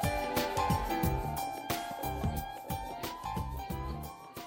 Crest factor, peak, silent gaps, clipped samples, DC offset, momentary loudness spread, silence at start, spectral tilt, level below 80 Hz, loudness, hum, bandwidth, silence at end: 16 dB; -18 dBFS; none; under 0.1%; under 0.1%; 8 LU; 0 s; -5 dB/octave; -44 dBFS; -35 LUFS; none; 17 kHz; 0 s